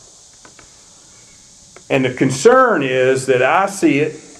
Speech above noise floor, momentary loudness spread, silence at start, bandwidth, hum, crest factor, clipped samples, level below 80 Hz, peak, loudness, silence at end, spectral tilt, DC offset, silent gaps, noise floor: 31 dB; 7 LU; 1.9 s; 13.5 kHz; none; 16 dB; under 0.1%; -58 dBFS; 0 dBFS; -14 LUFS; 0.2 s; -5 dB/octave; under 0.1%; none; -44 dBFS